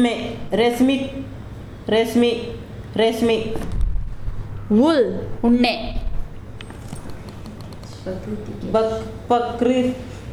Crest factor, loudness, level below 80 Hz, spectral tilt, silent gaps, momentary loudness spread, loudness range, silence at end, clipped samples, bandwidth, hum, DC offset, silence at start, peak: 16 dB; -21 LUFS; -32 dBFS; -6 dB/octave; none; 19 LU; 7 LU; 0 s; under 0.1%; 14.5 kHz; none; under 0.1%; 0 s; -4 dBFS